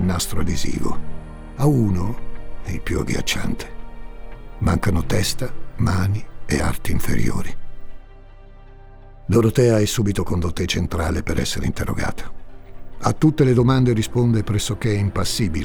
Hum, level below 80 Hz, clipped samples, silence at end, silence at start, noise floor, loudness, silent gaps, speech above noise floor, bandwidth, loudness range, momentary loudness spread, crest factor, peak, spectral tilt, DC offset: none; -32 dBFS; under 0.1%; 0 s; 0 s; -41 dBFS; -21 LUFS; none; 22 dB; 18.5 kHz; 5 LU; 20 LU; 14 dB; -4 dBFS; -5.5 dB/octave; under 0.1%